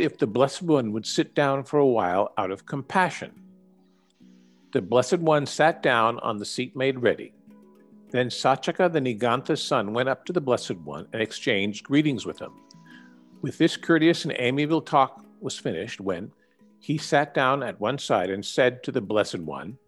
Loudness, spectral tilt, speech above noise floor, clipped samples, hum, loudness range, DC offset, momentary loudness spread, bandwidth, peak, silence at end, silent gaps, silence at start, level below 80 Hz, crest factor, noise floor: -25 LUFS; -5 dB/octave; 36 dB; under 0.1%; none; 3 LU; under 0.1%; 12 LU; 12 kHz; -6 dBFS; 0.1 s; none; 0 s; -70 dBFS; 20 dB; -61 dBFS